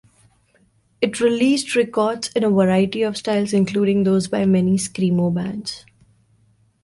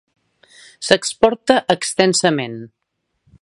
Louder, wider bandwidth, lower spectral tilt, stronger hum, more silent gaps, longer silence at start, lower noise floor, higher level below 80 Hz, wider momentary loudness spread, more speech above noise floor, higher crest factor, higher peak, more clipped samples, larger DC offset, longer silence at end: second, -19 LUFS vs -16 LUFS; about the same, 11.5 kHz vs 11.5 kHz; first, -6 dB/octave vs -3.5 dB/octave; neither; neither; first, 1 s vs 0.8 s; second, -60 dBFS vs -73 dBFS; about the same, -56 dBFS vs -56 dBFS; second, 8 LU vs 14 LU; second, 41 dB vs 57 dB; second, 14 dB vs 20 dB; second, -4 dBFS vs 0 dBFS; neither; neither; first, 1.05 s vs 0.75 s